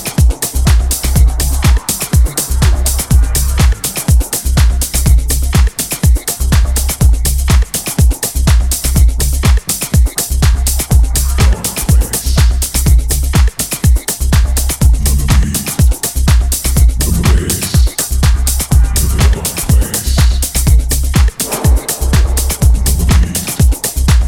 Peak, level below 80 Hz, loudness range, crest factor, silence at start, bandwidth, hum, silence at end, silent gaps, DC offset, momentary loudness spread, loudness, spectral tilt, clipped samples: 0 dBFS; -12 dBFS; 0 LU; 10 dB; 0 s; 19 kHz; none; 0 s; none; under 0.1%; 2 LU; -12 LUFS; -4 dB/octave; under 0.1%